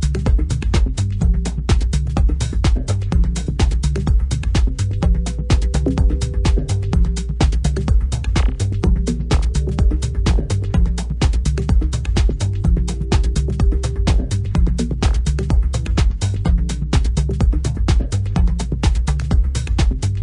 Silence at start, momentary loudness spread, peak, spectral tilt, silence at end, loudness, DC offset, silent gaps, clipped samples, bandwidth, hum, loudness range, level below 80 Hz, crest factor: 0 s; 2 LU; -2 dBFS; -6 dB/octave; 0 s; -19 LUFS; under 0.1%; none; under 0.1%; 10.5 kHz; none; 0 LU; -18 dBFS; 14 dB